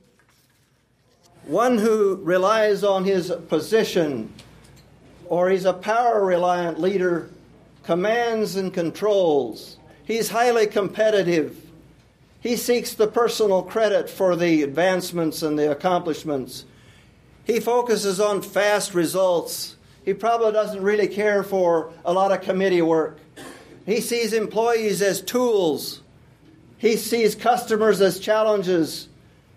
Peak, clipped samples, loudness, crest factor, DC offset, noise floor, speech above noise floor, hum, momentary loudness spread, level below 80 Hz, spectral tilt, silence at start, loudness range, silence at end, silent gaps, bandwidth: -6 dBFS; under 0.1%; -21 LUFS; 16 dB; under 0.1%; -62 dBFS; 41 dB; none; 10 LU; -62 dBFS; -4.5 dB/octave; 1.45 s; 2 LU; 0.5 s; none; 15.5 kHz